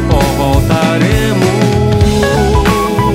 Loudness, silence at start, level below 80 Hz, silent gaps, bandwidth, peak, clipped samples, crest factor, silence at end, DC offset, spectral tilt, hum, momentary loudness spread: -11 LUFS; 0 s; -18 dBFS; none; 16.5 kHz; 0 dBFS; under 0.1%; 10 dB; 0 s; under 0.1%; -6 dB/octave; none; 1 LU